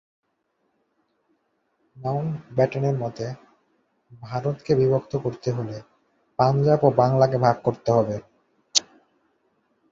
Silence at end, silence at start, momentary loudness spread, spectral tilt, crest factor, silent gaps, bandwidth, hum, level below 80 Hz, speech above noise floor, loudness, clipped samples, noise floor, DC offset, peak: 1.1 s; 1.95 s; 15 LU; -5.5 dB/octave; 22 dB; none; 7.8 kHz; none; -58 dBFS; 51 dB; -23 LUFS; under 0.1%; -73 dBFS; under 0.1%; -2 dBFS